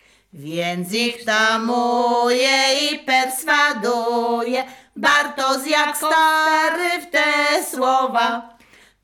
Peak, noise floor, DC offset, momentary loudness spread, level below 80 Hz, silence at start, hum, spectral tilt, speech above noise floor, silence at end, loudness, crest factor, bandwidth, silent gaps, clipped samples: -6 dBFS; -51 dBFS; under 0.1%; 8 LU; -66 dBFS; 0.35 s; none; -2 dB/octave; 33 dB; 0.55 s; -18 LUFS; 14 dB; 18 kHz; none; under 0.1%